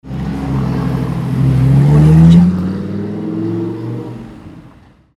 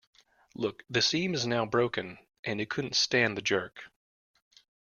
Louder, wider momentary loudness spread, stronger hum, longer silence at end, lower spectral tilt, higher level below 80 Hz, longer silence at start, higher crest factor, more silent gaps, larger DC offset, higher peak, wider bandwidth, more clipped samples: first, -13 LUFS vs -29 LUFS; first, 17 LU vs 13 LU; neither; second, 0.5 s vs 0.95 s; first, -9.5 dB/octave vs -3.5 dB/octave; first, -28 dBFS vs -68 dBFS; second, 0.05 s vs 0.6 s; second, 12 dB vs 22 dB; second, none vs 2.39-2.43 s; neither; first, 0 dBFS vs -10 dBFS; about the same, 7.8 kHz vs 7.2 kHz; neither